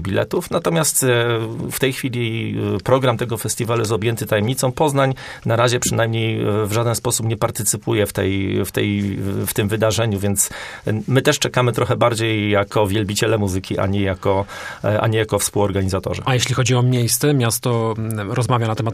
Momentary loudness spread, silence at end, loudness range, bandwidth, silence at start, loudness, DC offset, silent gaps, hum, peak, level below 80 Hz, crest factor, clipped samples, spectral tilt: 6 LU; 0 s; 2 LU; 15.5 kHz; 0 s; -19 LUFS; under 0.1%; none; none; 0 dBFS; -48 dBFS; 18 dB; under 0.1%; -4.5 dB/octave